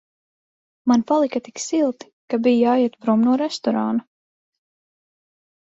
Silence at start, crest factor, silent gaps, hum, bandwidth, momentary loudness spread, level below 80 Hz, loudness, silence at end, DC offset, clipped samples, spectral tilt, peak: 0.85 s; 16 dB; 2.13-2.28 s; none; 8 kHz; 10 LU; -68 dBFS; -20 LUFS; 1.75 s; under 0.1%; under 0.1%; -5 dB/octave; -6 dBFS